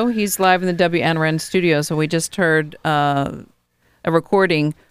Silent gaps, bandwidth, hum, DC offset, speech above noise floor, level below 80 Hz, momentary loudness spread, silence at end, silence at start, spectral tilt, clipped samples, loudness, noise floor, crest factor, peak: none; 15.5 kHz; none; under 0.1%; 43 dB; -52 dBFS; 5 LU; 0.2 s; 0 s; -5 dB/octave; under 0.1%; -18 LUFS; -61 dBFS; 18 dB; 0 dBFS